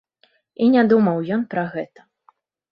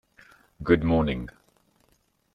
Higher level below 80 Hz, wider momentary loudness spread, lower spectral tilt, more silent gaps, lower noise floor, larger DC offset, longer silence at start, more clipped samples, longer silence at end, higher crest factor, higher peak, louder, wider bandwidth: second, -66 dBFS vs -44 dBFS; about the same, 15 LU vs 16 LU; about the same, -10 dB/octave vs -9 dB/octave; neither; second, -62 dBFS vs -68 dBFS; neither; about the same, 0.6 s vs 0.6 s; neither; second, 0.85 s vs 1.05 s; second, 16 dB vs 22 dB; about the same, -4 dBFS vs -6 dBFS; first, -19 LUFS vs -25 LUFS; about the same, 5.4 kHz vs 5.6 kHz